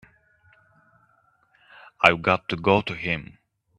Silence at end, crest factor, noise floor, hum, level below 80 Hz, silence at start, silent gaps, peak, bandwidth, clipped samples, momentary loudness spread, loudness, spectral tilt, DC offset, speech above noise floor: 0.55 s; 26 dB; -64 dBFS; none; -58 dBFS; 2 s; none; 0 dBFS; 11 kHz; under 0.1%; 10 LU; -22 LUFS; -6 dB/octave; under 0.1%; 41 dB